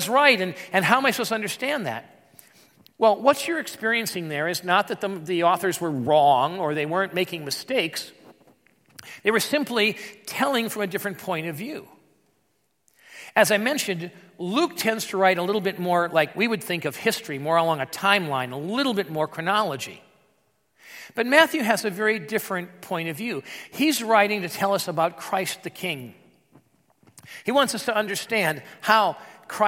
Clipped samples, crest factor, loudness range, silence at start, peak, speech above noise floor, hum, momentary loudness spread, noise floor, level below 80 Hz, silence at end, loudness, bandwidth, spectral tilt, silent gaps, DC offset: under 0.1%; 24 dB; 4 LU; 0 s; 0 dBFS; 47 dB; none; 13 LU; -71 dBFS; -76 dBFS; 0 s; -23 LUFS; 16.5 kHz; -3.5 dB/octave; none; under 0.1%